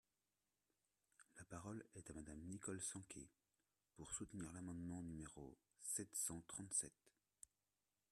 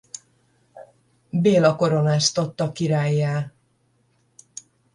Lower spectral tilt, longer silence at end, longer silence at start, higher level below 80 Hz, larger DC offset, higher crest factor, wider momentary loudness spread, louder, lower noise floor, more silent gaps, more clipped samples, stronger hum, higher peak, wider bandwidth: second, -3.5 dB/octave vs -5.5 dB/octave; second, 1.05 s vs 1.45 s; first, 1.2 s vs 0.75 s; second, -74 dBFS vs -62 dBFS; neither; first, 24 dB vs 18 dB; second, 20 LU vs 23 LU; second, -50 LUFS vs -21 LUFS; first, under -90 dBFS vs -65 dBFS; neither; neither; neither; second, -30 dBFS vs -4 dBFS; first, 13.5 kHz vs 11 kHz